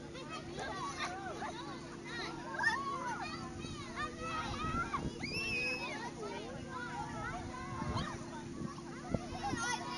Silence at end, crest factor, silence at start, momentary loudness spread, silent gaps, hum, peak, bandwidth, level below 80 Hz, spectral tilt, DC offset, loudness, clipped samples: 0 s; 22 dB; 0 s; 10 LU; none; none; -18 dBFS; 11.5 kHz; -56 dBFS; -4 dB/octave; under 0.1%; -40 LUFS; under 0.1%